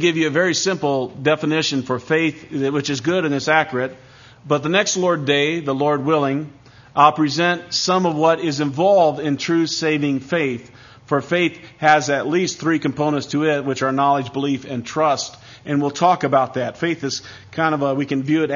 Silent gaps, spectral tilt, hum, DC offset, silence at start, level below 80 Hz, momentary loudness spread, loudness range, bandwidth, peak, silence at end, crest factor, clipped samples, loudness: none; -4.5 dB/octave; none; under 0.1%; 0 s; -60 dBFS; 8 LU; 3 LU; 7.4 kHz; 0 dBFS; 0 s; 18 dB; under 0.1%; -19 LUFS